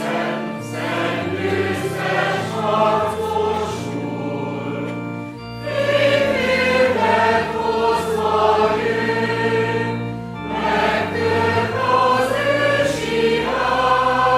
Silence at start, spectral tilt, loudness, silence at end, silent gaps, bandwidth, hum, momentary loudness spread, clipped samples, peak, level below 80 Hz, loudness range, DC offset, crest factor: 0 s; -5.5 dB/octave; -19 LUFS; 0 s; none; 15 kHz; none; 10 LU; under 0.1%; -4 dBFS; -46 dBFS; 4 LU; under 0.1%; 16 dB